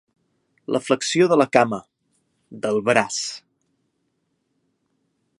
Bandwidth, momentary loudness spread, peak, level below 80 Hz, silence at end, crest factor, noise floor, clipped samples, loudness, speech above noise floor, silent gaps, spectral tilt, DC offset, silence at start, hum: 11.5 kHz; 15 LU; 0 dBFS; -68 dBFS; 2 s; 24 dB; -72 dBFS; under 0.1%; -20 LUFS; 52 dB; none; -4 dB/octave; under 0.1%; 0.7 s; none